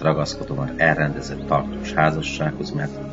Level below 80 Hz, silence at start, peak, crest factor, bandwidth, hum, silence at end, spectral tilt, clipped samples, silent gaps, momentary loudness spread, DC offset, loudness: -40 dBFS; 0 s; -2 dBFS; 22 dB; 8 kHz; none; 0 s; -6 dB/octave; under 0.1%; none; 9 LU; 0.1%; -22 LUFS